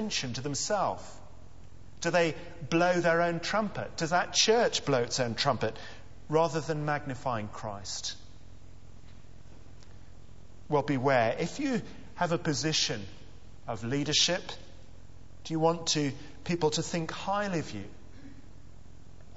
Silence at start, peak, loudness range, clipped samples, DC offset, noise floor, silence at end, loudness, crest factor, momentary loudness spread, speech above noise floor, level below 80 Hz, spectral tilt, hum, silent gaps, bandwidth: 0 s; -12 dBFS; 9 LU; under 0.1%; 0.7%; -52 dBFS; 0 s; -29 LUFS; 20 dB; 17 LU; 23 dB; -56 dBFS; -3.5 dB/octave; none; none; 8 kHz